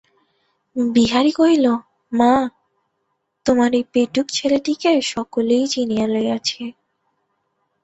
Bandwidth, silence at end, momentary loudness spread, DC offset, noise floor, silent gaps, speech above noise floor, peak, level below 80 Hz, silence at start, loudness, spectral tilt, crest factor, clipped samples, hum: 8.2 kHz; 1.1 s; 10 LU; under 0.1%; -72 dBFS; none; 55 dB; -2 dBFS; -54 dBFS; 0.75 s; -18 LUFS; -4 dB/octave; 18 dB; under 0.1%; none